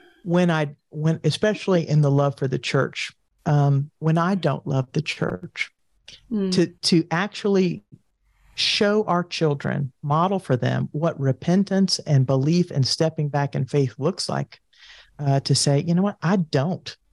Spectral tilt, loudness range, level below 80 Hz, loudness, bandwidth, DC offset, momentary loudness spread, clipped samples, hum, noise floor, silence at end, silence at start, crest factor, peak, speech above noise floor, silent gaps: -6 dB/octave; 2 LU; -60 dBFS; -22 LUFS; 11.5 kHz; under 0.1%; 8 LU; under 0.1%; none; -60 dBFS; 0.2 s; 0.25 s; 14 dB; -8 dBFS; 39 dB; none